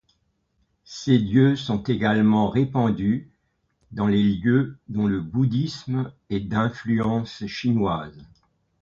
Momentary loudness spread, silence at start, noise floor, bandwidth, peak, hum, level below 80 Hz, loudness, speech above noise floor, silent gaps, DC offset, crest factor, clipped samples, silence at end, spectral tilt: 10 LU; 0.9 s; -70 dBFS; 7.4 kHz; -6 dBFS; none; -50 dBFS; -23 LUFS; 48 dB; none; under 0.1%; 18 dB; under 0.1%; 0.6 s; -7.5 dB/octave